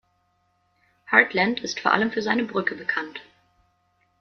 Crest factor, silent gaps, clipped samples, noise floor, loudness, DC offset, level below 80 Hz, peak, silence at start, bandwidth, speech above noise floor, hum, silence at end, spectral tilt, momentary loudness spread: 24 dB; none; under 0.1%; -68 dBFS; -22 LUFS; under 0.1%; -68 dBFS; -2 dBFS; 1.1 s; 7 kHz; 45 dB; none; 1 s; -4 dB/octave; 11 LU